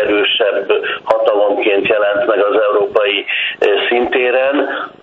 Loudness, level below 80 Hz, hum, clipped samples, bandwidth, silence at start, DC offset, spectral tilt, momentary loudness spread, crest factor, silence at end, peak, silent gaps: -14 LUFS; -56 dBFS; none; under 0.1%; 5.4 kHz; 0 s; under 0.1%; -5 dB/octave; 4 LU; 14 dB; 0.1 s; 0 dBFS; none